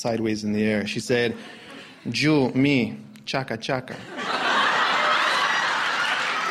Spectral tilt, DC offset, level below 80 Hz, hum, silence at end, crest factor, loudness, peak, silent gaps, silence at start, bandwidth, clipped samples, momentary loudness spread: -4.5 dB/octave; under 0.1%; -60 dBFS; none; 0 s; 16 dB; -23 LUFS; -8 dBFS; none; 0 s; 14.5 kHz; under 0.1%; 15 LU